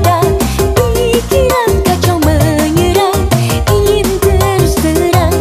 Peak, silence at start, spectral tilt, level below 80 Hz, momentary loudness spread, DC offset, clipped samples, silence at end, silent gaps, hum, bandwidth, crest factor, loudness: 0 dBFS; 0 s; -5.5 dB/octave; -20 dBFS; 2 LU; under 0.1%; under 0.1%; 0 s; none; none; 16 kHz; 10 dB; -11 LUFS